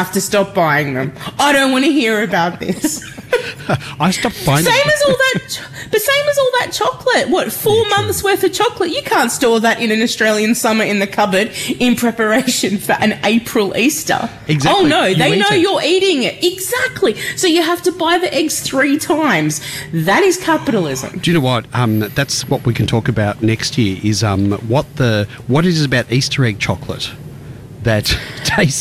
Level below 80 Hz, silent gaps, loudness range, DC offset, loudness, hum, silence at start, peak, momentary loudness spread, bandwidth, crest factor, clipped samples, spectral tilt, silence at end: -42 dBFS; none; 3 LU; under 0.1%; -15 LUFS; none; 0 s; -4 dBFS; 7 LU; 16 kHz; 10 dB; under 0.1%; -4.5 dB/octave; 0 s